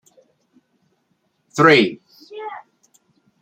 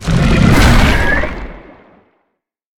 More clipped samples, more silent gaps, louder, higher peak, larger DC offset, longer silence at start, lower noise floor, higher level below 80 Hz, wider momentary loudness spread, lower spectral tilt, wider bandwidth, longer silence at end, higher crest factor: neither; neither; second, -15 LUFS vs -11 LUFS; about the same, -2 dBFS vs 0 dBFS; neither; first, 1.55 s vs 0 s; about the same, -68 dBFS vs -69 dBFS; second, -66 dBFS vs -18 dBFS; first, 27 LU vs 17 LU; about the same, -5 dB/octave vs -5.5 dB/octave; second, 15.5 kHz vs 17.5 kHz; second, 0.85 s vs 1.2 s; first, 20 dB vs 12 dB